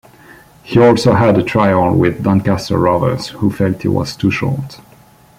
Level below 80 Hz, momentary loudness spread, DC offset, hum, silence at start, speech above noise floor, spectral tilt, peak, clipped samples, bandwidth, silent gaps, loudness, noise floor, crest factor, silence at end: -44 dBFS; 8 LU; under 0.1%; none; 0.65 s; 32 dB; -7 dB/octave; 0 dBFS; under 0.1%; 16 kHz; none; -14 LUFS; -45 dBFS; 14 dB; 0.65 s